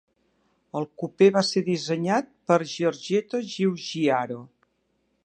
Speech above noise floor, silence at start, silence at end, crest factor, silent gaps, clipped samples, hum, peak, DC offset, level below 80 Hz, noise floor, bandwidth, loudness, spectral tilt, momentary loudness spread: 47 dB; 0.75 s; 0.8 s; 20 dB; none; under 0.1%; none; -6 dBFS; under 0.1%; -74 dBFS; -72 dBFS; 9.6 kHz; -25 LUFS; -5.5 dB/octave; 13 LU